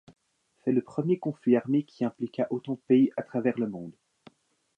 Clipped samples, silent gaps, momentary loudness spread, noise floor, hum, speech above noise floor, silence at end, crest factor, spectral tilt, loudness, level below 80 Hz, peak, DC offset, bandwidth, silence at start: under 0.1%; none; 11 LU; -71 dBFS; none; 44 dB; 0.85 s; 18 dB; -9 dB/octave; -28 LUFS; -76 dBFS; -10 dBFS; under 0.1%; 5.6 kHz; 0.65 s